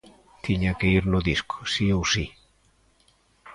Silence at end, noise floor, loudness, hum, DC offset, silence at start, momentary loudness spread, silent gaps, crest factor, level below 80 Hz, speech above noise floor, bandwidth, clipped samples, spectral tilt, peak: 0 s; -63 dBFS; -24 LUFS; none; under 0.1%; 0.45 s; 7 LU; none; 18 dB; -40 dBFS; 39 dB; 11 kHz; under 0.1%; -5 dB/octave; -8 dBFS